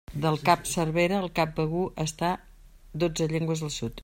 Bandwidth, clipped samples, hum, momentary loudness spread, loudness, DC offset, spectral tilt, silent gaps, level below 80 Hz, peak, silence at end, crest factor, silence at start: 16 kHz; under 0.1%; none; 6 LU; -27 LUFS; under 0.1%; -5 dB/octave; none; -48 dBFS; -8 dBFS; 0 s; 20 dB; 0.1 s